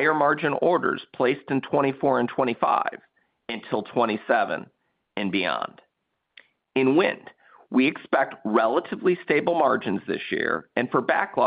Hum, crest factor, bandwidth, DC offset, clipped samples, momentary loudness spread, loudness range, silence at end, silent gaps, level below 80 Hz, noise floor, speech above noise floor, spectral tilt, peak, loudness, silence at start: none; 18 dB; 5 kHz; under 0.1%; under 0.1%; 8 LU; 4 LU; 0 s; none; -70 dBFS; -78 dBFS; 54 dB; -10 dB/octave; -6 dBFS; -24 LUFS; 0 s